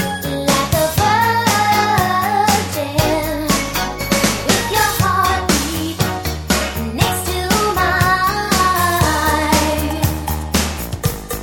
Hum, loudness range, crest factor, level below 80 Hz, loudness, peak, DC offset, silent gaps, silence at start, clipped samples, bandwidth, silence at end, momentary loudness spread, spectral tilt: none; 2 LU; 16 dB; -30 dBFS; -16 LUFS; 0 dBFS; under 0.1%; none; 0 s; under 0.1%; 19.5 kHz; 0 s; 6 LU; -3.5 dB/octave